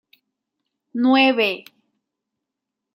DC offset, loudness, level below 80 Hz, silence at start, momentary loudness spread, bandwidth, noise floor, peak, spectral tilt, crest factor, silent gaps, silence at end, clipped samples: under 0.1%; -17 LUFS; -80 dBFS; 0.95 s; 17 LU; 15 kHz; -83 dBFS; -2 dBFS; -5 dB/octave; 20 dB; none; 1.35 s; under 0.1%